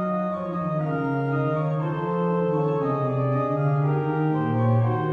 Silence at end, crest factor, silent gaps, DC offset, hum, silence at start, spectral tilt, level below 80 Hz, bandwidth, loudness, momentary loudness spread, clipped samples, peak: 0 s; 12 dB; none; under 0.1%; none; 0 s; -10.5 dB/octave; -60 dBFS; 4.4 kHz; -24 LUFS; 4 LU; under 0.1%; -10 dBFS